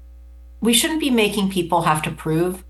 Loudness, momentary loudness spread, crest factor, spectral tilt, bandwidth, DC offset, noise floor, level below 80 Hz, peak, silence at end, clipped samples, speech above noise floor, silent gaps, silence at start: -19 LUFS; 5 LU; 18 dB; -4 dB/octave; 13 kHz; under 0.1%; -41 dBFS; -42 dBFS; -2 dBFS; 0 s; under 0.1%; 22 dB; none; 0 s